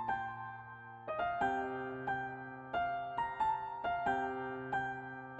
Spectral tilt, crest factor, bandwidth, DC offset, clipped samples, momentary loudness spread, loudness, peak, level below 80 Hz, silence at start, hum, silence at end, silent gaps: -6.5 dB/octave; 16 dB; 8.4 kHz; under 0.1%; under 0.1%; 11 LU; -38 LUFS; -22 dBFS; -66 dBFS; 0 s; none; 0 s; none